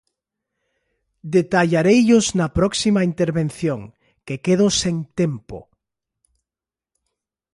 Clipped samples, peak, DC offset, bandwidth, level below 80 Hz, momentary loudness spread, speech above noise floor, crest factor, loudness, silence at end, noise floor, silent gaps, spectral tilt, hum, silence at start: under 0.1%; -4 dBFS; under 0.1%; 11.5 kHz; -46 dBFS; 16 LU; 72 dB; 16 dB; -18 LUFS; 1.95 s; -90 dBFS; none; -5 dB/octave; none; 1.25 s